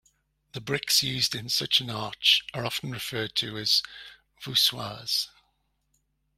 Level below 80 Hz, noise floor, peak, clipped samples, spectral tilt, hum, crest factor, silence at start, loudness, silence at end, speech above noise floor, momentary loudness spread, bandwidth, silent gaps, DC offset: -64 dBFS; -73 dBFS; -6 dBFS; under 0.1%; -2 dB/octave; none; 24 dB; 0.55 s; -25 LUFS; 1.1 s; 45 dB; 16 LU; 16 kHz; none; under 0.1%